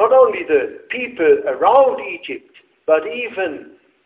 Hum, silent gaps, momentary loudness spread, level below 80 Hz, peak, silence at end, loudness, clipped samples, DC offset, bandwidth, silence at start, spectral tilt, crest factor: none; none; 16 LU; -60 dBFS; 0 dBFS; 0.4 s; -17 LUFS; under 0.1%; under 0.1%; 4 kHz; 0 s; -8 dB/octave; 16 dB